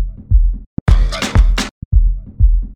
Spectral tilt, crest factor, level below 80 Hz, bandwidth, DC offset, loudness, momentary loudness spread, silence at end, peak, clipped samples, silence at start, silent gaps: -5.5 dB/octave; 12 dB; -14 dBFS; 9.8 kHz; 0.3%; -17 LUFS; 6 LU; 0 s; 0 dBFS; under 0.1%; 0 s; 0.66-0.86 s, 1.71-1.91 s